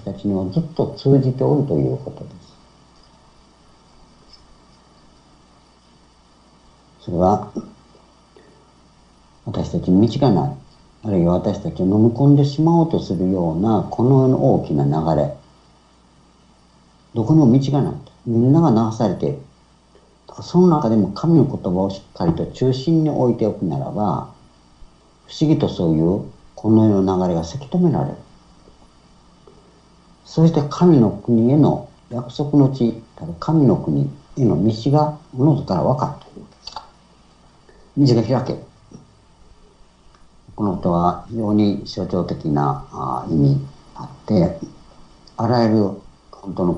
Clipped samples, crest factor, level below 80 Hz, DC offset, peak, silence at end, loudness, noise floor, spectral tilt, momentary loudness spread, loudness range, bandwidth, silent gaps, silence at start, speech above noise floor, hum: under 0.1%; 18 dB; -48 dBFS; under 0.1%; -2 dBFS; 0 s; -18 LUFS; -52 dBFS; -9 dB/octave; 17 LU; 7 LU; 8 kHz; none; 0.05 s; 35 dB; none